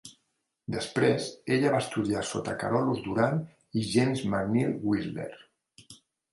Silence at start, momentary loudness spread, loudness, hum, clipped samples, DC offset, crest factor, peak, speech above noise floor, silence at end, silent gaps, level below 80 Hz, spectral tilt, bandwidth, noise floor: 0.05 s; 9 LU; -29 LUFS; none; under 0.1%; under 0.1%; 18 dB; -10 dBFS; 50 dB; 0.35 s; none; -60 dBFS; -6 dB/octave; 11.5 kHz; -78 dBFS